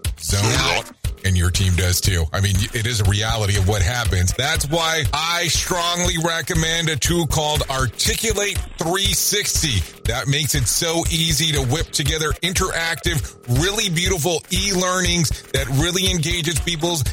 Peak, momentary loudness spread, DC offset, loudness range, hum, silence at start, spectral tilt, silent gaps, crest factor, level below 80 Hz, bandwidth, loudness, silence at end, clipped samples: -6 dBFS; 4 LU; under 0.1%; 1 LU; none; 0.05 s; -3 dB/octave; none; 14 dB; -30 dBFS; 16.5 kHz; -19 LUFS; 0 s; under 0.1%